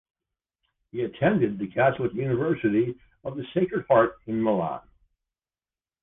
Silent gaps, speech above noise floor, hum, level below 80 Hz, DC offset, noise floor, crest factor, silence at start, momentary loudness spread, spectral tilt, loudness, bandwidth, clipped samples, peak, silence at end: none; over 66 dB; none; -58 dBFS; under 0.1%; under -90 dBFS; 18 dB; 0.95 s; 14 LU; -10.5 dB/octave; -25 LUFS; 3.8 kHz; under 0.1%; -8 dBFS; 1.25 s